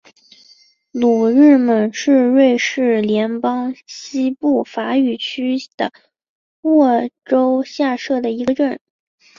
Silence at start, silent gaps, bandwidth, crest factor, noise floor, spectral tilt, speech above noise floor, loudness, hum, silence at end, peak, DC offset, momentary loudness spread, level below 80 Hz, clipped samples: 0.95 s; 5.74-5.78 s, 6.29-6.63 s; 7.4 kHz; 14 dB; -51 dBFS; -5 dB/octave; 36 dB; -16 LUFS; none; 0.6 s; -2 dBFS; under 0.1%; 13 LU; -62 dBFS; under 0.1%